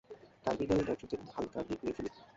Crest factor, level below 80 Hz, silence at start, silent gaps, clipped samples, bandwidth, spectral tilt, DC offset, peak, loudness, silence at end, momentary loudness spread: 20 dB; -58 dBFS; 0.1 s; none; under 0.1%; 7.6 kHz; -6 dB/octave; under 0.1%; -18 dBFS; -37 LUFS; 0.05 s; 10 LU